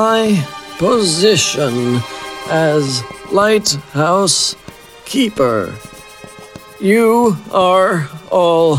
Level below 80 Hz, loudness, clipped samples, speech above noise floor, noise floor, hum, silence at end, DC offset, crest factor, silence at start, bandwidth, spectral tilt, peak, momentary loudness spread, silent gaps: -50 dBFS; -14 LUFS; under 0.1%; 22 dB; -36 dBFS; none; 0 s; under 0.1%; 14 dB; 0 s; 16.5 kHz; -4 dB/octave; 0 dBFS; 18 LU; none